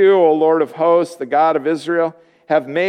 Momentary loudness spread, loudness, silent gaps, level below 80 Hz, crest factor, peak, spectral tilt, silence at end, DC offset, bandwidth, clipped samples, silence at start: 7 LU; -16 LUFS; none; -74 dBFS; 14 dB; -2 dBFS; -6 dB/octave; 0 s; under 0.1%; 10 kHz; under 0.1%; 0 s